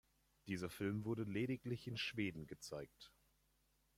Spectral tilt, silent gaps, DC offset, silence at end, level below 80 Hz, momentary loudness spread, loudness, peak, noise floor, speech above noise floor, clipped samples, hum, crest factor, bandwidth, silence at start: -5.5 dB/octave; none; under 0.1%; 0.9 s; -74 dBFS; 16 LU; -45 LUFS; -28 dBFS; -79 dBFS; 35 dB; under 0.1%; none; 18 dB; 16.5 kHz; 0.45 s